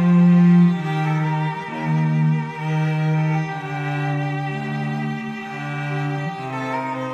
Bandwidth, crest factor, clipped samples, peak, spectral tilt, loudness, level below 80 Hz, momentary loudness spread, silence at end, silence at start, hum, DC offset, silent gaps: 6.8 kHz; 14 dB; under 0.1%; -6 dBFS; -8.5 dB/octave; -21 LUFS; -62 dBFS; 12 LU; 0 s; 0 s; none; under 0.1%; none